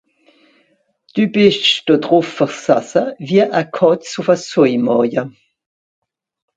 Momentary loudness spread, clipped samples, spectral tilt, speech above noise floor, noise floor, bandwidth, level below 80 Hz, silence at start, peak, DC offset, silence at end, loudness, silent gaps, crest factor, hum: 6 LU; under 0.1%; -5 dB/octave; 46 dB; -60 dBFS; 9.2 kHz; -62 dBFS; 1.15 s; 0 dBFS; under 0.1%; 1.25 s; -15 LUFS; none; 16 dB; none